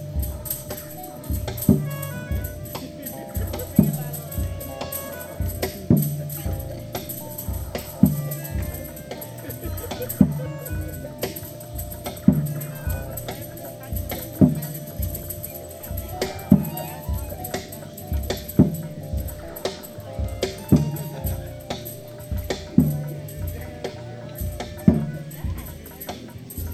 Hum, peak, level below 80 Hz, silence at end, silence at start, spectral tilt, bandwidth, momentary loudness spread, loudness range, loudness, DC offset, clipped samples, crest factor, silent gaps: none; 0 dBFS; -36 dBFS; 0 s; 0 s; -6.5 dB/octave; over 20 kHz; 14 LU; 3 LU; -26 LUFS; under 0.1%; under 0.1%; 26 dB; none